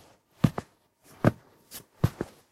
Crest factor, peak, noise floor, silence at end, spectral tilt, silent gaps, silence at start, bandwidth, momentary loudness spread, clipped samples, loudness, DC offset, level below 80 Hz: 24 dB; -6 dBFS; -60 dBFS; 0.3 s; -7.5 dB/octave; none; 0.45 s; 16 kHz; 18 LU; under 0.1%; -30 LUFS; under 0.1%; -50 dBFS